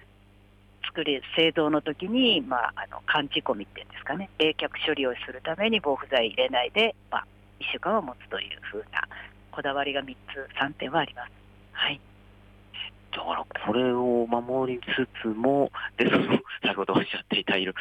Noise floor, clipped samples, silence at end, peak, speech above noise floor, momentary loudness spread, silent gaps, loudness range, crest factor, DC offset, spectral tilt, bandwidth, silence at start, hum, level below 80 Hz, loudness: -56 dBFS; under 0.1%; 0 s; -10 dBFS; 29 dB; 13 LU; none; 6 LU; 18 dB; under 0.1%; -6.5 dB/octave; 9 kHz; 0.85 s; 50 Hz at -55 dBFS; -58 dBFS; -27 LUFS